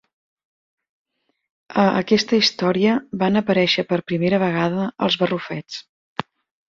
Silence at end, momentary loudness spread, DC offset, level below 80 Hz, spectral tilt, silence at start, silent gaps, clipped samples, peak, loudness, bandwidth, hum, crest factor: 0.45 s; 15 LU; under 0.1%; -60 dBFS; -5.5 dB/octave; 1.7 s; 5.89-6.16 s; under 0.1%; -2 dBFS; -19 LUFS; 7.4 kHz; none; 20 dB